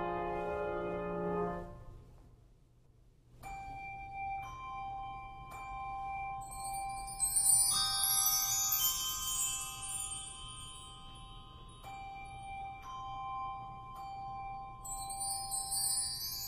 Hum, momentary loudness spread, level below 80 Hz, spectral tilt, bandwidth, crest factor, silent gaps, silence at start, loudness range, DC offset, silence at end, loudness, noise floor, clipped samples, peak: none; 19 LU; -56 dBFS; -1 dB/octave; 15.5 kHz; 22 dB; none; 0 s; 16 LU; under 0.1%; 0 s; -34 LUFS; -64 dBFS; under 0.1%; -16 dBFS